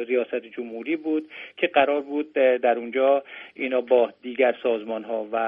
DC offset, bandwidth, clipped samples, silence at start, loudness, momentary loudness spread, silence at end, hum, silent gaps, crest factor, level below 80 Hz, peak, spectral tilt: under 0.1%; 3.8 kHz; under 0.1%; 0 s; -24 LUFS; 11 LU; 0 s; none; none; 18 dB; -74 dBFS; -4 dBFS; -7.5 dB/octave